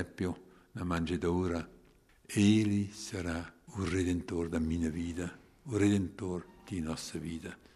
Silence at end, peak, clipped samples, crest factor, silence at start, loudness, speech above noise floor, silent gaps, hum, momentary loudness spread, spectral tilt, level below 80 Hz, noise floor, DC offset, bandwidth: 0.2 s; -16 dBFS; under 0.1%; 18 dB; 0 s; -34 LUFS; 30 dB; none; none; 13 LU; -6 dB/octave; -52 dBFS; -63 dBFS; under 0.1%; 13 kHz